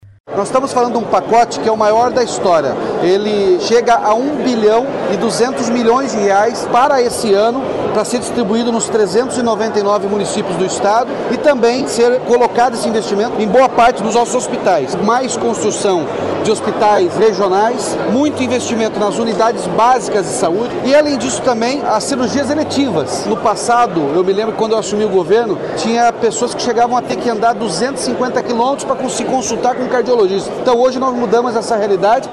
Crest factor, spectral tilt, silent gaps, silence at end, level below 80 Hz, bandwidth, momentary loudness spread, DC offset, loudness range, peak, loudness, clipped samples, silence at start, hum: 14 dB; -4 dB/octave; 0.20-0.24 s; 0 s; -50 dBFS; 12.5 kHz; 5 LU; under 0.1%; 2 LU; 0 dBFS; -14 LUFS; under 0.1%; 0.05 s; none